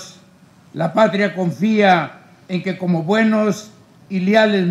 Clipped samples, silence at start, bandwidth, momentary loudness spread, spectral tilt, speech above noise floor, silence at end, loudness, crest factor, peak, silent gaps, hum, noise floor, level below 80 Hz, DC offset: under 0.1%; 0 s; 12.5 kHz; 13 LU; -6.5 dB/octave; 32 dB; 0 s; -17 LUFS; 16 dB; -2 dBFS; none; none; -48 dBFS; -68 dBFS; under 0.1%